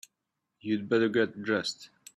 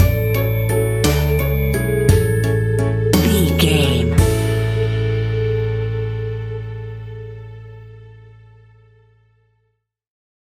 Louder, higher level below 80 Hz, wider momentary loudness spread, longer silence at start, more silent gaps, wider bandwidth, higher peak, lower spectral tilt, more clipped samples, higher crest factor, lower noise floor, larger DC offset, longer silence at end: second, -29 LUFS vs -17 LUFS; second, -74 dBFS vs -28 dBFS; second, 14 LU vs 17 LU; first, 0.65 s vs 0 s; neither; second, 12.5 kHz vs 17 kHz; second, -14 dBFS vs -2 dBFS; about the same, -5 dB/octave vs -6 dB/octave; neither; about the same, 18 dB vs 16 dB; first, -84 dBFS vs -69 dBFS; neither; second, 0.3 s vs 2.3 s